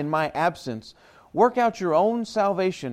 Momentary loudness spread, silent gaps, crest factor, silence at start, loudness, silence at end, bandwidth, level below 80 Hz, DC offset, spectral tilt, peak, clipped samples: 14 LU; none; 18 dB; 0 s; -23 LUFS; 0 s; 15.5 kHz; -64 dBFS; under 0.1%; -6 dB/octave; -6 dBFS; under 0.1%